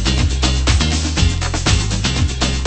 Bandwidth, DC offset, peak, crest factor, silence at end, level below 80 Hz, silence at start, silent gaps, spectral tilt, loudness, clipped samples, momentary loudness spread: 8.8 kHz; under 0.1%; -2 dBFS; 14 dB; 0 s; -20 dBFS; 0 s; none; -4 dB/octave; -17 LUFS; under 0.1%; 2 LU